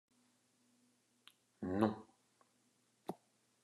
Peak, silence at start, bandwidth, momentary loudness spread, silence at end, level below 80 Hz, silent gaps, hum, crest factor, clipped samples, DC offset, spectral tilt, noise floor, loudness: -18 dBFS; 1.6 s; 12.5 kHz; 16 LU; 0.5 s; -80 dBFS; none; none; 28 dB; under 0.1%; under 0.1%; -7.5 dB/octave; -77 dBFS; -42 LUFS